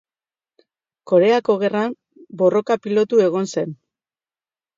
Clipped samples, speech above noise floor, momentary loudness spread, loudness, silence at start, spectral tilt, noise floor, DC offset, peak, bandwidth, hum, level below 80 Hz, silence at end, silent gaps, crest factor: under 0.1%; over 73 dB; 11 LU; -19 LUFS; 1.05 s; -6 dB/octave; under -90 dBFS; under 0.1%; -4 dBFS; 7.6 kHz; none; -72 dBFS; 1.05 s; none; 16 dB